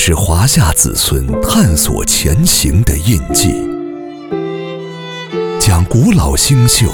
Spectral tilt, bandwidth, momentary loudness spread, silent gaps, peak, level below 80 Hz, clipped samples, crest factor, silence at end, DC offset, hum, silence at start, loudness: -4 dB/octave; over 20 kHz; 13 LU; none; 0 dBFS; -20 dBFS; 0.2%; 12 dB; 0 s; under 0.1%; none; 0 s; -11 LUFS